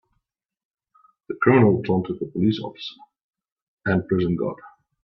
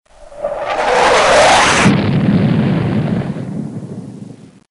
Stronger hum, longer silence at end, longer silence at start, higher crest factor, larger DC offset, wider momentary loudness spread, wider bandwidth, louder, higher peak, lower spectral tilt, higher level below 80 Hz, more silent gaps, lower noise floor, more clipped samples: neither; about the same, 0.35 s vs 0.35 s; first, 1.3 s vs 0.2 s; first, 20 dB vs 14 dB; neither; about the same, 19 LU vs 19 LU; second, 6 kHz vs 11.5 kHz; second, -22 LUFS vs -12 LUFS; second, -4 dBFS vs 0 dBFS; first, -9.5 dB/octave vs -5 dB/octave; second, -58 dBFS vs -38 dBFS; first, 3.24-3.31 s, 3.52-3.56 s, 3.62-3.77 s vs none; first, -77 dBFS vs -35 dBFS; neither